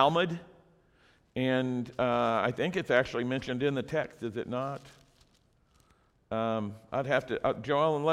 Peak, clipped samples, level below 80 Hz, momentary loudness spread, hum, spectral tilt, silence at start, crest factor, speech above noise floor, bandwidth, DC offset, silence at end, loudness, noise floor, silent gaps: -8 dBFS; under 0.1%; -62 dBFS; 10 LU; none; -6.5 dB/octave; 0 s; 24 dB; 37 dB; 12.5 kHz; under 0.1%; 0 s; -31 LUFS; -67 dBFS; none